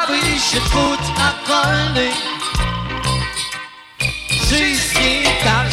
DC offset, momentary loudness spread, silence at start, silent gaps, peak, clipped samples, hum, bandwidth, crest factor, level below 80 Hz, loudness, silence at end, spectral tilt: under 0.1%; 8 LU; 0 s; none; -2 dBFS; under 0.1%; none; 16.5 kHz; 14 dB; -28 dBFS; -16 LUFS; 0 s; -3 dB/octave